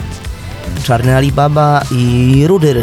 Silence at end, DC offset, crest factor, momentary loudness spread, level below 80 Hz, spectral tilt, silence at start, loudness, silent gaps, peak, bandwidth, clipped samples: 0 s; under 0.1%; 10 dB; 15 LU; -28 dBFS; -7 dB/octave; 0 s; -11 LUFS; none; 0 dBFS; 15 kHz; under 0.1%